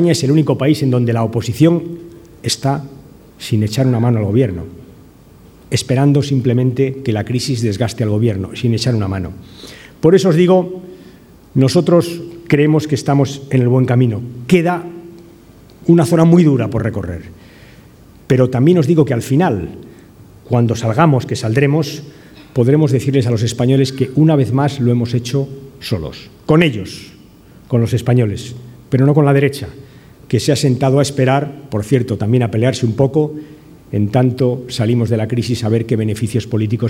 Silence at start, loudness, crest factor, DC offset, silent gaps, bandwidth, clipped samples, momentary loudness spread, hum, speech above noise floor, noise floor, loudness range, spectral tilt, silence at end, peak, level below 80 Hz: 0 s; -15 LUFS; 14 dB; under 0.1%; none; 15.5 kHz; under 0.1%; 14 LU; none; 28 dB; -42 dBFS; 3 LU; -7 dB/octave; 0 s; 0 dBFS; -46 dBFS